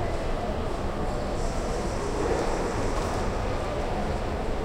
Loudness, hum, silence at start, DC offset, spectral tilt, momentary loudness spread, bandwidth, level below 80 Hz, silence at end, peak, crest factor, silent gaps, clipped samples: -30 LUFS; none; 0 s; under 0.1%; -5.5 dB/octave; 3 LU; 13 kHz; -32 dBFS; 0 s; -14 dBFS; 14 dB; none; under 0.1%